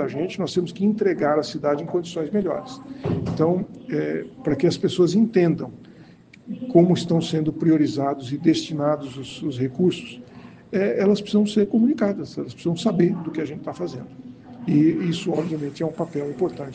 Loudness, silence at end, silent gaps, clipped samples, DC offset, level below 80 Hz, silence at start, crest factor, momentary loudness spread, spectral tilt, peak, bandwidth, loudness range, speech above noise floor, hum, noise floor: -23 LUFS; 0 s; none; under 0.1%; under 0.1%; -58 dBFS; 0 s; 20 dB; 12 LU; -7 dB/octave; -2 dBFS; 9.4 kHz; 3 LU; 26 dB; none; -48 dBFS